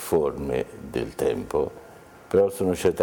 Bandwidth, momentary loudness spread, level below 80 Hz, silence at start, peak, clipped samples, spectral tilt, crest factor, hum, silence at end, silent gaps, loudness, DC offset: 20 kHz; 9 LU; -48 dBFS; 0 s; -10 dBFS; under 0.1%; -6 dB/octave; 16 dB; none; 0 s; none; -26 LUFS; under 0.1%